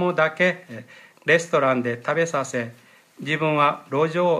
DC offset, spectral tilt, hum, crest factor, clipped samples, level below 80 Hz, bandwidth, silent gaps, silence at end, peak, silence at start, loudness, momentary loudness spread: under 0.1%; -5 dB/octave; none; 18 dB; under 0.1%; -72 dBFS; 13.5 kHz; none; 0 s; -4 dBFS; 0 s; -22 LUFS; 15 LU